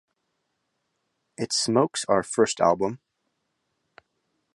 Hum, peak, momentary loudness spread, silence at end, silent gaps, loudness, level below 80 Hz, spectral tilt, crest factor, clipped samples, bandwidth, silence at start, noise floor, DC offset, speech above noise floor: none; -6 dBFS; 10 LU; 1.6 s; none; -24 LUFS; -64 dBFS; -3.5 dB/octave; 22 dB; under 0.1%; 11.5 kHz; 1.4 s; -77 dBFS; under 0.1%; 54 dB